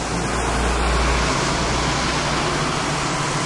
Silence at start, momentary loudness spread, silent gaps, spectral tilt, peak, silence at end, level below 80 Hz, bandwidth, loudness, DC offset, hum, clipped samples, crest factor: 0 s; 2 LU; none; -3.5 dB/octave; -8 dBFS; 0 s; -28 dBFS; 11.5 kHz; -20 LUFS; under 0.1%; none; under 0.1%; 12 dB